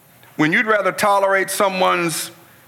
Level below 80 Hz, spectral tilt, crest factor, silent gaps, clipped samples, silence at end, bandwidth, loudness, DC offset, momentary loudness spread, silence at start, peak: -68 dBFS; -3.5 dB/octave; 14 dB; none; under 0.1%; 0.35 s; 17.5 kHz; -17 LUFS; under 0.1%; 10 LU; 0.4 s; -4 dBFS